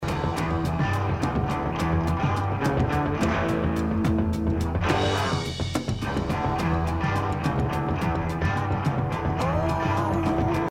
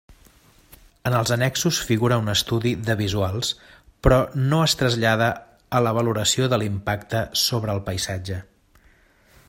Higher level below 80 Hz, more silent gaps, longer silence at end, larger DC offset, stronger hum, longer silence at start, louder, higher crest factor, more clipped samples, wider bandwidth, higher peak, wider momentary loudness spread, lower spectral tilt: about the same, -36 dBFS vs -40 dBFS; neither; second, 0 s vs 1.05 s; neither; neither; about the same, 0 s vs 0.1 s; second, -25 LUFS vs -22 LUFS; second, 16 dB vs 22 dB; neither; about the same, 16 kHz vs 16.5 kHz; second, -8 dBFS vs -2 dBFS; second, 3 LU vs 8 LU; first, -6.5 dB/octave vs -4.5 dB/octave